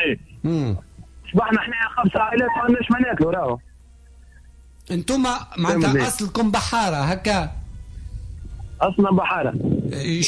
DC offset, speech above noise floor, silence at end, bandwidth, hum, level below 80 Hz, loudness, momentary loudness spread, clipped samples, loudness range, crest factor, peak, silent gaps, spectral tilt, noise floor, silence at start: under 0.1%; 27 dB; 0 s; 11 kHz; none; -40 dBFS; -21 LUFS; 18 LU; under 0.1%; 2 LU; 16 dB; -6 dBFS; none; -5 dB/octave; -47 dBFS; 0 s